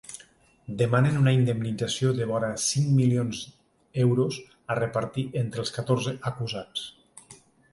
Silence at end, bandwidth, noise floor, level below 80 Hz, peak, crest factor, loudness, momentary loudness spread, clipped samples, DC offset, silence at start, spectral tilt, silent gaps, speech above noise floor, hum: 0.4 s; 11.5 kHz; -56 dBFS; -60 dBFS; -8 dBFS; 18 dB; -26 LUFS; 15 LU; under 0.1%; under 0.1%; 0.1 s; -5.5 dB/octave; none; 31 dB; none